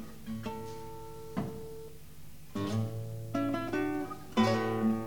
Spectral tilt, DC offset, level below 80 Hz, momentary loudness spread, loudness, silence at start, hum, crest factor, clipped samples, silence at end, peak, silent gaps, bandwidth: -6.5 dB/octave; 0.4%; -58 dBFS; 18 LU; -35 LUFS; 0 s; none; 20 dB; under 0.1%; 0 s; -14 dBFS; none; 19 kHz